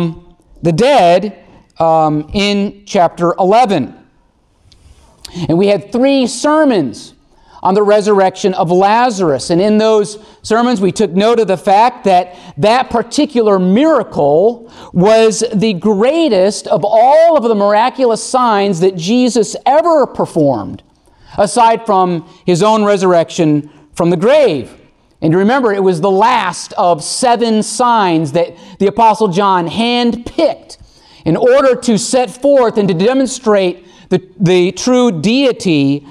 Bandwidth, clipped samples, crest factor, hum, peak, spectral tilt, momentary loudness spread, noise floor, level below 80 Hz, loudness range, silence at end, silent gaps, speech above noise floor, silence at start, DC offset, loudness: 12.5 kHz; under 0.1%; 10 dB; none; -2 dBFS; -5.5 dB/octave; 7 LU; -53 dBFS; -46 dBFS; 3 LU; 0 s; none; 42 dB; 0 s; under 0.1%; -12 LUFS